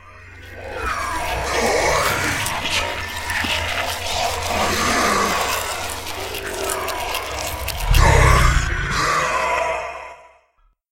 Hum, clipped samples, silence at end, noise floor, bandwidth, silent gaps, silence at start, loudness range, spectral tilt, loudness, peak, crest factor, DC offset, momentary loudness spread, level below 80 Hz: none; under 0.1%; 0.7 s; -60 dBFS; 17 kHz; none; 0.05 s; 3 LU; -3 dB/octave; -20 LUFS; -2 dBFS; 20 dB; under 0.1%; 10 LU; -26 dBFS